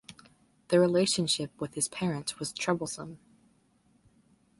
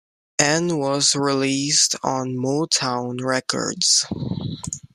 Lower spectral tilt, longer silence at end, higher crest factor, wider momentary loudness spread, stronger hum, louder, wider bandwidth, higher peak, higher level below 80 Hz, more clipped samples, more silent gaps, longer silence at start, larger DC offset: first, -4 dB/octave vs -2.5 dB/octave; first, 1.45 s vs 0.1 s; about the same, 20 dB vs 20 dB; about the same, 12 LU vs 11 LU; neither; second, -29 LUFS vs -20 LUFS; second, 12 kHz vs 15.5 kHz; second, -12 dBFS vs -2 dBFS; second, -68 dBFS vs -56 dBFS; neither; neither; second, 0.1 s vs 0.4 s; neither